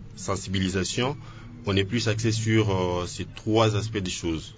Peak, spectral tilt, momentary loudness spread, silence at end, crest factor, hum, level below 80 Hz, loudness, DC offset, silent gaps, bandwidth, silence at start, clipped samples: -8 dBFS; -5 dB/octave; 10 LU; 0 s; 18 dB; none; -44 dBFS; -26 LUFS; under 0.1%; none; 8 kHz; 0 s; under 0.1%